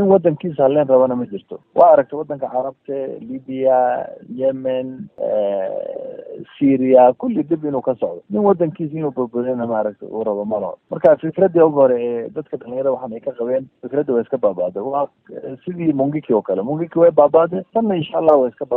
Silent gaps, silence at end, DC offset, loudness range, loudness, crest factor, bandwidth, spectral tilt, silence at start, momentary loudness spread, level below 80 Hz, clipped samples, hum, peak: none; 0 s; under 0.1%; 4 LU; -18 LUFS; 16 dB; 3.7 kHz; -11 dB/octave; 0 s; 15 LU; -62 dBFS; under 0.1%; none; 0 dBFS